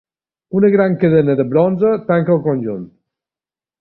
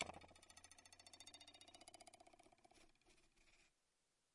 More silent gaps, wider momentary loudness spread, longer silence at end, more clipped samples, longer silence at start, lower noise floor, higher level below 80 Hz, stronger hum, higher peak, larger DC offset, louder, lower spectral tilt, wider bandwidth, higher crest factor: neither; first, 9 LU vs 5 LU; first, 0.95 s vs 0.45 s; neither; first, 0.5 s vs 0 s; about the same, under -90 dBFS vs -87 dBFS; first, -54 dBFS vs -82 dBFS; neither; first, -2 dBFS vs -26 dBFS; neither; first, -15 LUFS vs -61 LUFS; first, -12.5 dB/octave vs -2 dB/octave; second, 4.4 kHz vs 12 kHz; second, 14 dB vs 36 dB